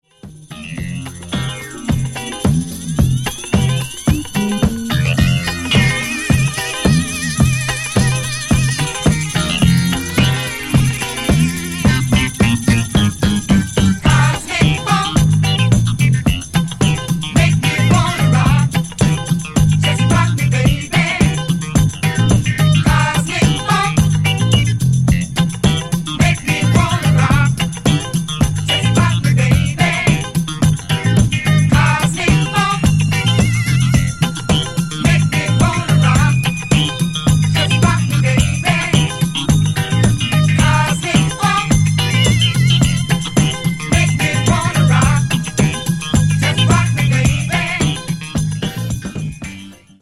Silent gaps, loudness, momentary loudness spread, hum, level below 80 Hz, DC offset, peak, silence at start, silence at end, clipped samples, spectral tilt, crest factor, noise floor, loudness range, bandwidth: none; -15 LUFS; 6 LU; none; -28 dBFS; under 0.1%; 0 dBFS; 0.25 s; 0.25 s; under 0.1%; -5 dB/octave; 14 dB; -37 dBFS; 2 LU; 15.5 kHz